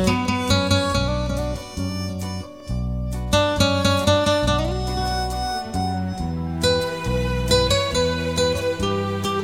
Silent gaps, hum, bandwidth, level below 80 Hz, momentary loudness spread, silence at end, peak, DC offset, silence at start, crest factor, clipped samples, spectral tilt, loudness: none; none; 16.5 kHz; -32 dBFS; 10 LU; 0 s; -4 dBFS; 0.3%; 0 s; 18 dB; under 0.1%; -5 dB/octave; -22 LUFS